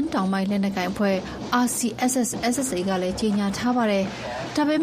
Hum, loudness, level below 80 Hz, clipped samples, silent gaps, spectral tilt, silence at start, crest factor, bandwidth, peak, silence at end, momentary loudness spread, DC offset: none; -24 LUFS; -50 dBFS; under 0.1%; none; -4.5 dB/octave; 0 s; 16 dB; 14.5 kHz; -8 dBFS; 0 s; 3 LU; under 0.1%